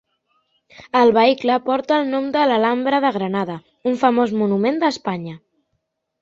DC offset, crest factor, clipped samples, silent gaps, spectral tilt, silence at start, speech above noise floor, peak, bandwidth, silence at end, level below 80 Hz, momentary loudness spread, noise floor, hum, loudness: under 0.1%; 18 dB; under 0.1%; none; -6 dB/octave; 0.8 s; 56 dB; -2 dBFS; 7.6 kHz; 0.85 s; -64 dBFS; 10 LU; -73 dBFS; none; -18 LUFS